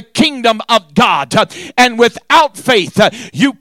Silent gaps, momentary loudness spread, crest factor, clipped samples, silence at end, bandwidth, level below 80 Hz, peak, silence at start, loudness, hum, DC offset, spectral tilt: none; 5 LU; 12 dB; under 0.1%; 0.1 s; 17 kHz; -48 dBFS; 0 dBFS; 0.15 s; -12 LUFS; none; under 0.1%; -4 dB/octave